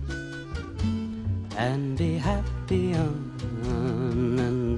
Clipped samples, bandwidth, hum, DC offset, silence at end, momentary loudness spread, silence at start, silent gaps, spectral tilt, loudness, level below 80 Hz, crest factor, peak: under 0.1%; 11 kHz; none; under 0.1%; 0 s; 8 LU; 0 s; none; -7.5 dB/octave; -28 LUFS; -38 dBFS; 16 dB; -12 dBFS